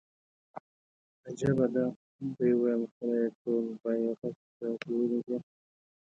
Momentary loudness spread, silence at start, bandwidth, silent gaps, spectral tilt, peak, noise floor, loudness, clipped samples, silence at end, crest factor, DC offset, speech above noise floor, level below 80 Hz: 14 LU; 0.55 s; 7.8 kHz; 0.60-1.24 s, 1.96-2.19 s, 2.91-3.01 s, 3.35-3.45 s, 4.18-4.22 s, 4.36-4.60 s; -8.5 dB/octave; -16 dBFS; under -90 dBFS; -32 LUFS; under 0.1%; 0.7 s; 16 dB; under 0.1%; over 60 dB; -68 dBFS